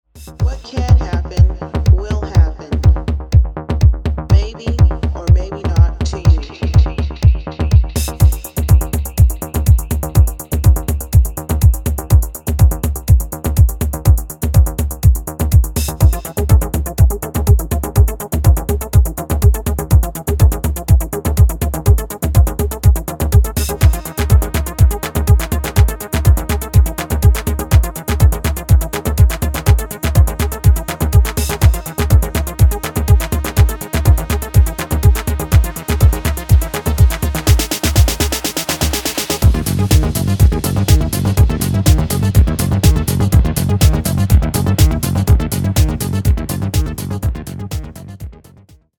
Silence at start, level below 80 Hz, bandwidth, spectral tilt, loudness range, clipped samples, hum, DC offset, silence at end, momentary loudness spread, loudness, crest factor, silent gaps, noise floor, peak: 0.15 s; -16 dBFS; 18.5 kHz; -5.5 dB/octave; 1 LU; under 0.1%; none; under 0.1%; 0.65 s; 6 LU; -15 LUFS; 12 dB; none; -45 dBFS; 0 dBFS